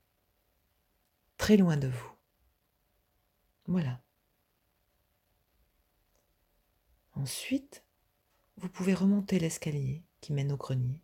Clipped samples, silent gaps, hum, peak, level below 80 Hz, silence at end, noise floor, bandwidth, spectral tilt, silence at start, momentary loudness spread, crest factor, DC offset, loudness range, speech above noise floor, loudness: under 0.1%; none; none; -10 dBFS; -60 dBFS; 0.05 s; -76 dBFS; 16.5 kHz; -6.5 dB/octave; 1.4 s; 19 LU; 24 dB; under 0.1%; 10 LU; 46 dB; -31 LUFS